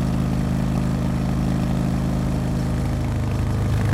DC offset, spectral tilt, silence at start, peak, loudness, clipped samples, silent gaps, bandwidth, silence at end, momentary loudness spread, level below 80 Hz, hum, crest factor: under 0.1%; -7.5 dB/octave; 0 s; -8 dBFS; -23 LUFS; under 0.1%; none; 14.5 kHz; 0 s; 1 LU; -30 dBFS; none; 12 dB